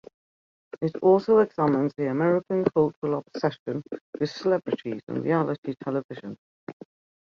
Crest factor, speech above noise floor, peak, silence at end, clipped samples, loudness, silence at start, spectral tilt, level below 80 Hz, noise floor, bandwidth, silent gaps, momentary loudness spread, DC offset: 20 dB; over 65 dB; -6 dBFS; 0.5 s; under 0.1%; -25 LUFS; 0.8 s; -8 dB/octave; -66 dBFS; under -90 dBFS; 7 kHz; 2.96-3.02 s, 3.59-3.66 s, 4.01-4.13 s, 5.03-5.07 s, 5.58-5.63 s, 6.04-6.09 s, 6.38-6.67 s; 18 LU; under 0.1%